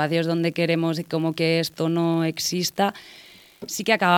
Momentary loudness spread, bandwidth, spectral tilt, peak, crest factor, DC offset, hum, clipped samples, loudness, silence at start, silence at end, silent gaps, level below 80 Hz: 8 LU; 18 kHz; -4.5 dB/octave; -4 dBFS; 20 dB; under 0.1%; none; under 0.1%; -23 LUFS; 0 s; 0 s; none; -68 dBFS